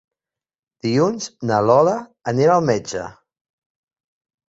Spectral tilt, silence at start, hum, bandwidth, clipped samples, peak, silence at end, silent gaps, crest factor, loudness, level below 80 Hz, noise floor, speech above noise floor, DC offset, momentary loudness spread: -6 dB/octave; 0.85 s; none; 8 kHz; under 0.1%; -2 dBFS; 1.4 s; none; 18 dB; -19 LUFS; -58 dBFS; -87 dBFS; 70 dB; under 0.1%; 13 LU